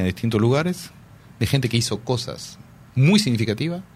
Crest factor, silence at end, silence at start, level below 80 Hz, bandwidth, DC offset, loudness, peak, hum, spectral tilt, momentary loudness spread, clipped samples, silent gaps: 18 dB; 0.15 s; 0 s; -50 dBFS; 15.5 kHz; under 0.1%; -21 LUFS; -4 dBFS; none; -5.5 dB/octave; 15 LU; under 0.1%; none